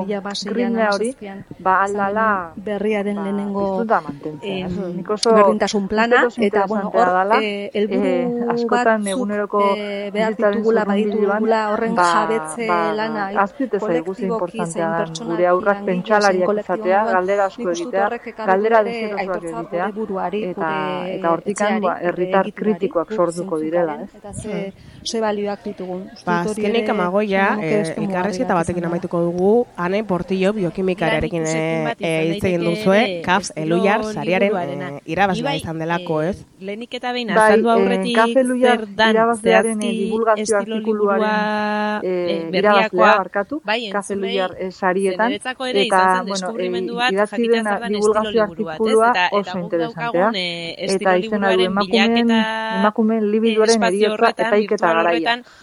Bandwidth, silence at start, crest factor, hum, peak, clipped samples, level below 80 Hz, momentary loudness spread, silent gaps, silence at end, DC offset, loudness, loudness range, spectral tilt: 12 kHz; 0 s; 18 dB; none; 0 dBFS; under 0.1%; -52 dBFS; 9 LU; none; 0.2 s; under 0.1%; -19 LUFS; 4 LU; -5 dB/octave